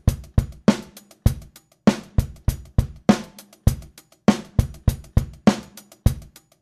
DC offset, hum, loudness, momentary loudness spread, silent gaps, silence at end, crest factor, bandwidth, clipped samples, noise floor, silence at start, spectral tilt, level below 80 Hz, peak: under 0.1%; none; -23 LUFS; 10 LU; none; 0.4 s; 22 dB; 14 kHz; under 0.1%; -44 dBFS; 0.05 s; -7 dB/octave; -30 dBFS; 0 dBFS